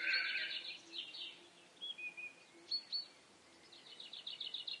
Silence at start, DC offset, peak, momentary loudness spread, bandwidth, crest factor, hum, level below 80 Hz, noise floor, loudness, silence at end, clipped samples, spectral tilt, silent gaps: 0 s; under 0.1%; -24 dBFS; 21 LU; 11.5 kHz; 22 dB; none; under -90 dBFS; -64 dBFS; -43 LUFS; 0 s; under 0.1%; 0.5 dB/octave; none